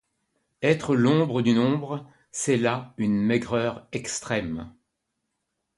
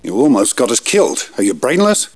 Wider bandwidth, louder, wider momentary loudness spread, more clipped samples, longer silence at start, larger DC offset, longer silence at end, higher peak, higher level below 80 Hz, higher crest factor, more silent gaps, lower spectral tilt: about the same, 11.5 kHz vs 11 kHz; second, -25 LUFS vs -13 LUFS; first, 13 LU vs 5 LU; neither; first, 0.6 s vs 0.05 s; second, under 0.1% vs 0.4%; first, 1.05 s vs 0.1 s; second, -6 dBFS vs -2 dBFS; about the same, -58 dBFS vs -60 dBFS; first, 20 dB vs 12 dB; neither; first, -5.5 dB/octave vs -3.5 dB/octave